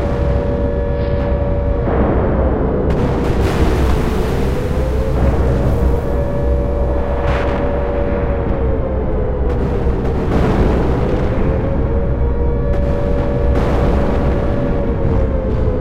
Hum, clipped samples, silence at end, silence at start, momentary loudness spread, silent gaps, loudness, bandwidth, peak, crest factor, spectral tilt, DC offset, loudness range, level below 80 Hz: none; under 0.1%; 0 s; 0 s; 3 LU; none; -17 LUFS; 8.2 kHz; -2 dBFS; 12 dB; -8.5 dB/octave; under 0.1%; 2 LU; -18 dBFS